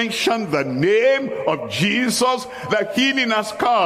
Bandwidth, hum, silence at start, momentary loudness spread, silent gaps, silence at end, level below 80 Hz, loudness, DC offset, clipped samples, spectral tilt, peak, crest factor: 15.5 kHz; none; 0 s; 6 LU; none; 0 s; -60 dBFS; -19 LUFS; under 0.1%; under 0.1%; -4 dB/octave; -4 dBFS; 16 dB